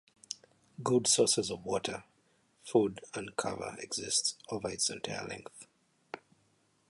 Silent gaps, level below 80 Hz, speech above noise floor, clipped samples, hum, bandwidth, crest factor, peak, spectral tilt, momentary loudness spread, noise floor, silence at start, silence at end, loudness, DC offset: none; -68 dBFS; 39 dB; under 0.1%; none; 11.5 kHz; 22 dB; -14 dBFS; -3 dB/octave; 21 LU; -72 dBFS; 0.3 s; 0.75 s; -32 LUFS; under 0.1%